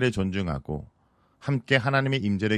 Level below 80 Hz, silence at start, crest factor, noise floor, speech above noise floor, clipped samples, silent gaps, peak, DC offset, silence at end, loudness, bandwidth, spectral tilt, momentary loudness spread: -46 dBFS; 0 s; 22 dB; -62 dBFS; 37 dB; under 0.1%; none; -4 dBFS; under 0.1%; 0 s; -26 LUFS; 10 kHz; -6.5 dB/octave; 14 LU